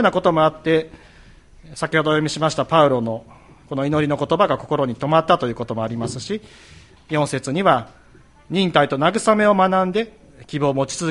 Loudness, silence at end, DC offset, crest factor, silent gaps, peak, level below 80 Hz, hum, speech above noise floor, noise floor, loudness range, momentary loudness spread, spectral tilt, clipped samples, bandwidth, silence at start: -19 LUFS; 0 s; under 0.1%; 18 dB; none; 0 dBFS; -52 dBFS; none; 30 dB; -49 dBFS; 3 LU; 12 LU; -5.5 dB/octave; under 0.1%; 11.5 kHz; 0 s